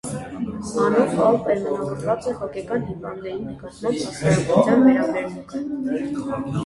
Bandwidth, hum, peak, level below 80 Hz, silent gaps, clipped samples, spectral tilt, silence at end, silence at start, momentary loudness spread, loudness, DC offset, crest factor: 11.5 kHz; none; -2 dBFS; -50 dBFS; none; under 0.1%; -6.5 dB/octave; 0 s; 0.05 s; 14 LU; -22 LUFS; under 0.1%; 20 dB